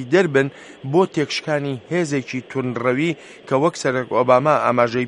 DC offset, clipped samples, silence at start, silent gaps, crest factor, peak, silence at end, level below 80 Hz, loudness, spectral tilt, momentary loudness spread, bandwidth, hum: under 0.1%; under 0.1%; 0 s; none; 18 dB; 0 dBFS; 0 s; -64 dBFS; -20 LUFS; -6 dB/octave; 9 LU; 11.5 kHz; none